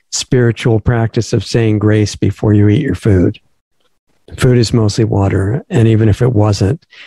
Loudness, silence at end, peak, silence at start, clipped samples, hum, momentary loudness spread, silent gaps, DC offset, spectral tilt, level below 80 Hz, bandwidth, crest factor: -13 LUFS; 0 s; 0 dBFS; 0.1 s; under 0.1%; none; 5 LU; 3.61-3.71 s, 3.99-4.07 s; under 0.1%; -6.5 dB/octave; -36 dBFS; 12 kHz; 12 dB